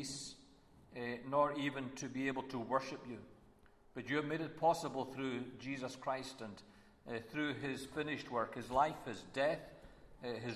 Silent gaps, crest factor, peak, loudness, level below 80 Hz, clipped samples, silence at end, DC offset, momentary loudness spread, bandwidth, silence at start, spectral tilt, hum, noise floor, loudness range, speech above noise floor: none; 22 dB; -20 dBFS; -40 LUFS; -70 dBFS; under 0.1%; 0 s; under 0.1%; 16 LU; 13.5 kHz; 0 s; -5 dB/octave; none; -65 dBFS; 3 LU; 25 dB